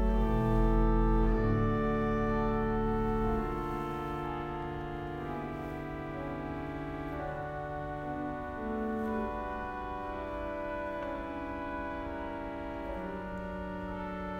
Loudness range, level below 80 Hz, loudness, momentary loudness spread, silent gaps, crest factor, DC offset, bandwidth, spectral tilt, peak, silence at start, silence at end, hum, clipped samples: 8 LU; -38 dBFS; -35 LUFS; 10 LU; none; 16 dB; under 0.1%; 6.2 kHz; -8.5 dB/octave; -16 dBFS; 0 s; 0 s; none; under 0.1%